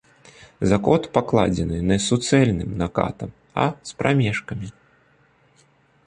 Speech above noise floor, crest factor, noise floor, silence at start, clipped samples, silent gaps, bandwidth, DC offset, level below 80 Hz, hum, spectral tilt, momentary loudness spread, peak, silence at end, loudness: 38 dB; 22 dB; -59 dBFS; 0.4 s; under 0.1%; none; 10 kHz; under 0.1%; -42 dBFS; none; -6 dB/octave; 11 LU; -2 dBFS; 1.35 s; -21 LUFS